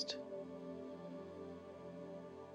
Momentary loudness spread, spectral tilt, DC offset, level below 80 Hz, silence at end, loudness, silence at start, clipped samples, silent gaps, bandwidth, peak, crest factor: 6 LU; -4.5 dB/octave; under 0.1%; -80 dBFS; 0 s; -50 LUFS; 0 s; under 0.1%; none; 15.5 kHz; -28 dBFS; 22 dB